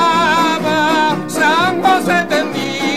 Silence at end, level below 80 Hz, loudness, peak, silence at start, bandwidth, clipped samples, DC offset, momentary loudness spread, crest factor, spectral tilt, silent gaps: 0 s; -54 dBFS; -14 LUFS; -2 dBFS; 0 s; 16 kHz; under 0.1%; 1%; 4 LU; 12 dB; -4 dB/octave; none